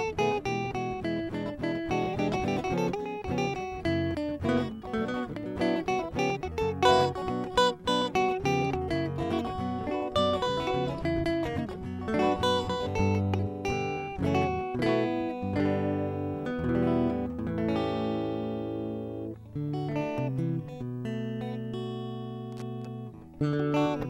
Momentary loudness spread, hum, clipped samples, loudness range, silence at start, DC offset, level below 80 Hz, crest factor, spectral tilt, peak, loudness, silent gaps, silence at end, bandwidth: 9 LU; none; under 0.1%; 6 LU; 0 s; under 0.1%; -50 dBFS; 22 dB; -6.5 dB/octave; -8 dBFS; -30 LUFS; none; 0 s; 15.5 kHz